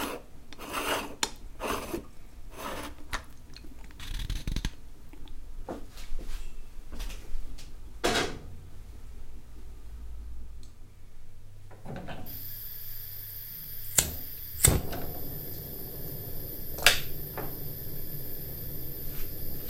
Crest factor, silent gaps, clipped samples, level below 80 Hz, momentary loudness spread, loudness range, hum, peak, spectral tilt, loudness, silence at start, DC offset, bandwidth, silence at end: 32 dB; none; under 0.1%; -40 dBFS; 23 LU; 15 LU; none; 0 dBFS; -2.5 dB/octave; -33 LUFS; 0 s; under 0.1%; 16.5 kHz; 0 s